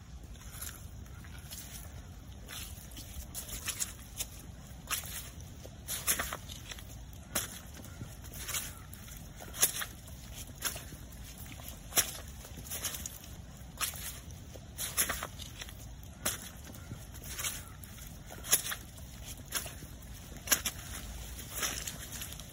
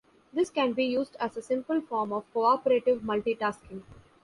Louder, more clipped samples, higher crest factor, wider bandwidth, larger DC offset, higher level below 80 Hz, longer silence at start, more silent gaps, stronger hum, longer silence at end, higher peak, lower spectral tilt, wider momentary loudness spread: second, -37 LUFS vs -28 LUFS; neither; first, 30 dB vs 16 dB; first, 16.5 kHz vs 11.5 kHz; neither; first, -50 dBFS vs -64 dBFS; second, 0 s vs 0.35 s; neither; neither; second, 0 s vs 0.3 s; about the same, -10 dBFS vs -12 dBFS; second, -1.5 dB/octave vs -5.5 dB/octave; first, 18 LU vs 10 LU